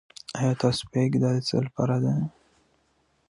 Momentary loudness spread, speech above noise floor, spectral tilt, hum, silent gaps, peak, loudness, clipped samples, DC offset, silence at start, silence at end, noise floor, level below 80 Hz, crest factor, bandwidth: 6 LU; 44 dB; -6.5 dB/octave; none; none; -8 dBFS; -26 LUFS; under 0.1%; under 0.1%; 0.3 s; 1 s; -68 dBFS; -58 dBFS; 18 dB; 11.5 kHz